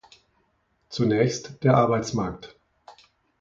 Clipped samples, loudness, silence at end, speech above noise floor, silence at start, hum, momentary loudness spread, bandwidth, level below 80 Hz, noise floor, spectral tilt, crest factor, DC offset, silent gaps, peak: under 0.1%; -23 LUFS; 0.5 s; 46 dB; 0.9 s; none; 14 LU; 7.8 kHz; -56 dBFS; -69 dBFS; -6.5 dB/octave; 20 dB; under 0.1%; none; -6 dBFS